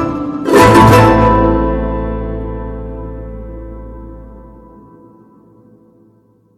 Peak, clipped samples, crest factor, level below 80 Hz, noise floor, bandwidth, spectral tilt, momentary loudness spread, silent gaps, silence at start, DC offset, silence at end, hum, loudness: 0 dBFS; under 0.1%; 14 dB; -26 dBFS; -51 dBFS; 15.5 kHz; -6.5 dB/octave; 25 LU; none; 0 s; under 0.1%; 2.1 s; none; -10 LUFS